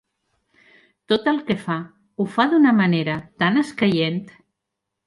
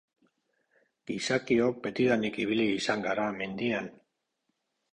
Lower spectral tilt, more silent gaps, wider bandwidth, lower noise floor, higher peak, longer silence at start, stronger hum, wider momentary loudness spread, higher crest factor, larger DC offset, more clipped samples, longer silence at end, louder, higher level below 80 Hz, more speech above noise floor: first, -7 dB/octave vs -5 dB/octave; neither; first, 11.5 kHz vs 10 kHz; about the same, -81 dBFS vs -80 dBFS; first, -2 dBFS vs -14 dBFS; about the same, 1.1 s vs 1.1 s; neither; first, 12 LU vs 8 LU; about the same, 20 dB vs 18 dB; neither; neither; second, 0.75 s vs 1 s; first, -20 LUFS vs -29 LUFS; about the same, -62 dBFS vs -66 dBFS; first, 62 dB vs 51 dB